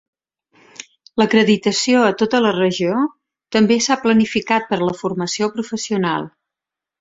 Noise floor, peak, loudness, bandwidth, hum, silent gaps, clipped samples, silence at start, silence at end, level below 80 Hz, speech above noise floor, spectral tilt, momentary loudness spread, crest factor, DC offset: -86 dBFS; -2 dBFS; -17 LUFS; 7.8 kHz; none; none; under 0.1%; 0.8 s; 0.7 s; -58 dBFS; 69 dB; -4.5 dB/octave; 10 LU; 16 dB; under 0.1%